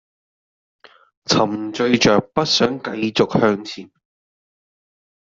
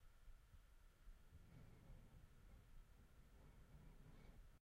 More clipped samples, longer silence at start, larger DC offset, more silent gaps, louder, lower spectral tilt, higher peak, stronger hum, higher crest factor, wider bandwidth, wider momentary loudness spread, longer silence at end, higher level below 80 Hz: neither; first, 1.3 s vs 0 s; neither; neither; first, -18 LUFS vs -68 LUFS; second, -4.5 dB/octave vs -6 dB/octave; first, -2 dBFS vs -52 dBFS; neither; first, 18 dB vs 12 dB; second, 7.8 kHz vs 15 kHz; first, 12 LU vs 2 LU; first, 1.5 s vs 0 s; first, -56 dBFS vs -66 dBFS